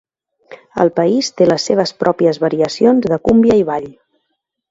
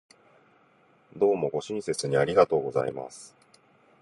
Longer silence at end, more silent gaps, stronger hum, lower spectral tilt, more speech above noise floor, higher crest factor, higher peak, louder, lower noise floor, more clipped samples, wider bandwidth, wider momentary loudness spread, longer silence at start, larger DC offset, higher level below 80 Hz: about the same, 0.8 s vs 0.75 s; neither; neither; about the same, -5.5 dB/octave vs -5 dB/octave; first, 58 dB vs 36 dB; second, 14 dB vs 22 dB; first, 0 dBFS vs -6 dBFS; first, -14 LUFS vs -26 LUFS; first, -72 dBFS vs -62 dBFS; neither; second, 8 kHz vs 11.5 kHz; second, 7 LU vs 16 LU; second, 0.5 s vs 1.15 s; neither; first, -46 dBFS vs -64 dBFS